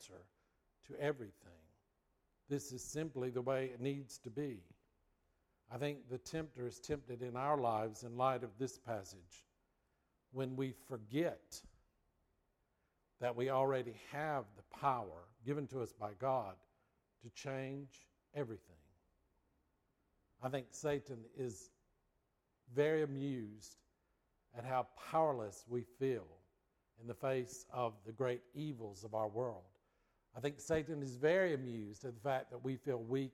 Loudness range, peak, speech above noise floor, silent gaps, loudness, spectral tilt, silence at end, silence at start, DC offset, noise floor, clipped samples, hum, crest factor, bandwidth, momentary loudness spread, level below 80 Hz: 7 LU; -22 dBFS; 41 dB; none; -42 LUFS; -6 dB/octave; 0.05 s; 0 s; under 0.1%; -83 dBFS; under 0.1%; none; 20 dB; 16 kHz; 16 LU; -74 dBFS